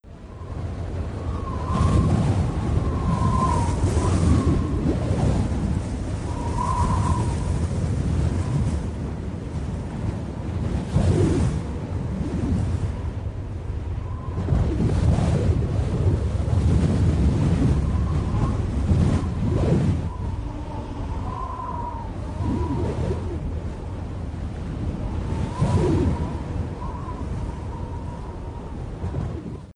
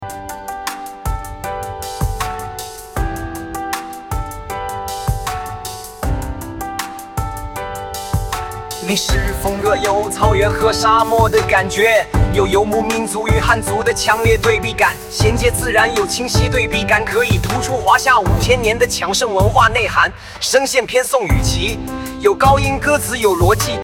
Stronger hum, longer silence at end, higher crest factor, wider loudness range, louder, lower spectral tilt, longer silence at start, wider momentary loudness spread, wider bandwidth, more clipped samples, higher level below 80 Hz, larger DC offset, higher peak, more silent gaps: neither; about the same, 0.05 s vs 0 s; about the same, 16 dB vs 16 dB; second, 7 LU vs 10 LU; second, -25 LUFS vs -16 LUFS; first, -8 dB/octave vs -4 dB/octave; about the same, 0.05 s vs 0 s; about the same, 11 LU vs 13 LU; second, 10.5 kHz vs 18 kHz; neither; about the same, -30 dBFS vs -26 dBFS; neither; second, -6 dBFS vs 0 dBFS; neither